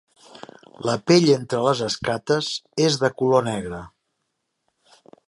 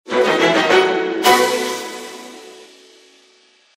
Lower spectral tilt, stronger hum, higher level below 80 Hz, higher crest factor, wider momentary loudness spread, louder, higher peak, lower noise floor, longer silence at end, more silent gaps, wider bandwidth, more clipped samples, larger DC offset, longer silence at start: first, -5 dB/octave vs -2.5 dB/octave; neither; first, -56 dBFS vs -64 dBFS; about the same, 20 dB vs 18 dB; second, 12 LU vs 21 LU; second, -21 LUFS vs -15 LUFS; about the same, -2 dBFS vs 0 dBFS; first, -76 dBFS vs -53 dBFS; first, 1.4 s vs 1.15 s; neither; second, 11.5 kHz vs 16 kHz; neither; neither; first, 0.35 s vs 0.05 s